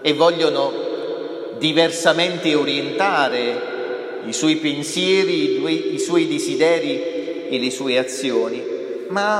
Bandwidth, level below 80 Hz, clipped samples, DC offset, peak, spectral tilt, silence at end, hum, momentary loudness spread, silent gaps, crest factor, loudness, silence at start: 14.5 kHz; -76 dBFS; under 0.1%; under 0.1%; -2 dBFS; -3.5 dB/octave; 0 s; none; 10 LU; none; 18 dB; -20 LUFS; 0 s